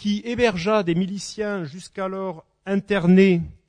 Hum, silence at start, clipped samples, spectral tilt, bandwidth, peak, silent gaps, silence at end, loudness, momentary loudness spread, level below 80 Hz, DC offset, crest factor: none; 0 s; under 0.1%; -6.5 dB/octave; 10 kHz; -4 dBFS; none; 0.15 s; -21 LUFS; 15 LU; -50 dBFS; under 0.1%; 16 dB